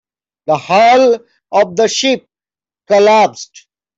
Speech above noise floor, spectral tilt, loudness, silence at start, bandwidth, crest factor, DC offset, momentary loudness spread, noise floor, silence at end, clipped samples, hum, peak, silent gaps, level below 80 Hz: over 79 dB; -3.5 dB/octave; -12 LUFS; 0.5 s; 8 kHz; 12 dB; under 0.1%; 13 LU; under -90 dBFS; 0.55 s; under 0.1%; none; -2 dBFS; none; -60 dBFS